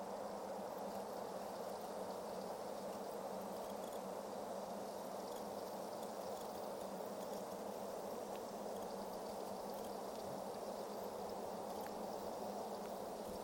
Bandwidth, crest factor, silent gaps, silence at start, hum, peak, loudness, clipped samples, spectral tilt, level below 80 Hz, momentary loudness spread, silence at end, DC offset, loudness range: 17 kHz; 14 dB; none; 0 s; none; -34 dBFS; -47 LUFS; under 0.1%; -4.5 dB/octave; -76 dBFS; 1 LU; 0 s; under 0.1%; 0 LU